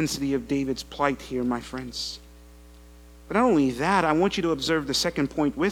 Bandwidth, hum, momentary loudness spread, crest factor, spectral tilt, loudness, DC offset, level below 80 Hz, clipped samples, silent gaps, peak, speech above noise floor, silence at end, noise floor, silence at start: 18 kHz; none; 10 LU; 20 dB; -4.5 dB/octave; -25 LUFS; under 0.1%; -48 dBFS; under 0.1%; none; -6 dBFS; 23 dB; 0 s; -48 dBFS; 0 s